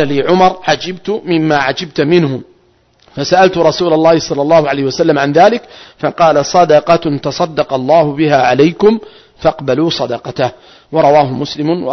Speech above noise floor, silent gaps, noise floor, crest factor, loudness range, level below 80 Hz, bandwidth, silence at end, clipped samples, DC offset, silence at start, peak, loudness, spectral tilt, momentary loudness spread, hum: 40 dB; none; -51 dBFS; 12 dB; 3 LU; -46 dBFS; 6.4 kHz; 0 s; under 0.1%; under 0.1%; 0 s; 0 dBFS; -12 LUFS; -5.5 dB/octave; 10 LU; none